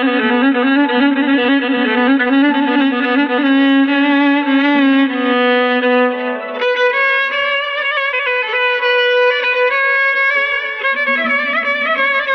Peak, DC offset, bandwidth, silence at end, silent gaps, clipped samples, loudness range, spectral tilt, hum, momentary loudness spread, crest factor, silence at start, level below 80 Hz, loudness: -2 dBFS; under 0.1%; 6 kHz; 0 s; none; under 0.1%; 2 LU; -4.5 dB/octave; none; 3 LU; 12 dB; 0 s; -64 dBFS; -13 LUFS